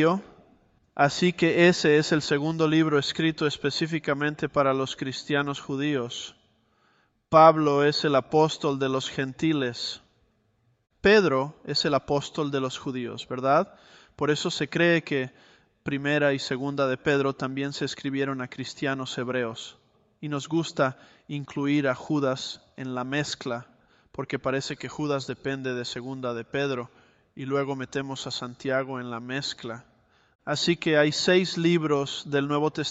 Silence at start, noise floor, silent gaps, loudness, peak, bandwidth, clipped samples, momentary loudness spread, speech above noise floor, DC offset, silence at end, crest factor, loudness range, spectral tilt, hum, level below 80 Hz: 0 s; -68 dBFS; 30.35-30.39 s; -26 LUFS; -4 dBFS; 8.2 kHz; under 0.1%; 12 LU; 43 dB; under 0.1%; 0 s; 22 dB; 8 LU; -5 dB/octave; none; -62 dBFS